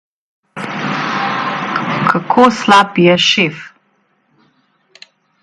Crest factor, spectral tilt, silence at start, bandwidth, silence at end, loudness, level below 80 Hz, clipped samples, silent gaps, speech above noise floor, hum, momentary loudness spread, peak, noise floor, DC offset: 16 dB; -4.5 dB/octave; 0.55 s; 11.5 kHz; 1.75 s; -13 LUFS; -58 dBFS; under 0.1%; none; 49 dB; none; 14 LU; 0 dBFS; -59 dBFS; under 0.1%